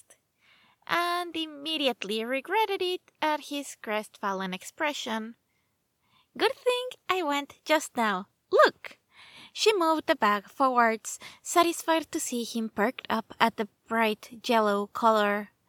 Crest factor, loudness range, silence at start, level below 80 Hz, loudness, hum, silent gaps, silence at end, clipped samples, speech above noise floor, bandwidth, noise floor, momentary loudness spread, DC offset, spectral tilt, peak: 24 dB; 6 LU; 0.9 s; -76 dBFS; -28 LUFS; none; none; 0.2 s; under 0.1%; 47 dB; 19 kHz; -75 dBFS; 11 LU; under 0.1%; -3 dB/octave; -4 dBFS